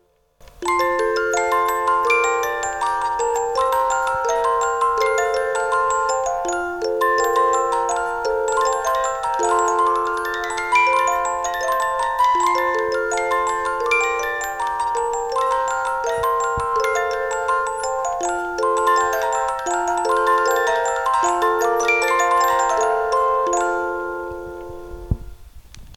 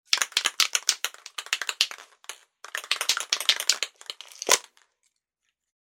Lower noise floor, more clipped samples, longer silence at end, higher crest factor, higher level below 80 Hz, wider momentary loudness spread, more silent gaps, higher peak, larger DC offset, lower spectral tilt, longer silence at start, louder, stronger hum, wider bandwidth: second, -49 dBFS vs -80 dBFS; neither; second, 0 s vs 1.25 s; second, 14 dB vs 28 dB; first, -44 dBFS vs -82 dBFS; second, 6 LU vs 18 LU; neither; second, -6 dBFS vs -2 dBFS; neither; first, -3 dB/octave vs 3.5 dB/octave; first, 0.6 s vs 0.1 s; first, -20 LUFS vs -25 LUFS; neither; about the same, 18 kHz vs 17 kHz